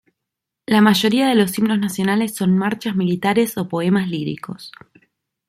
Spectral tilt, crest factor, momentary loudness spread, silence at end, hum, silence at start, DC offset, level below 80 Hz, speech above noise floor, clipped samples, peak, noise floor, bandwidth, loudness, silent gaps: -5.5 dB/octave; 16 dB; 15 LU; 0.8 s; none; 0.7 s; under 0.1%; -60 dBFS; 64 dB; under 0.1%; -2 dBFS; -82 dBFS; 16 kHz; -18 LUFS; none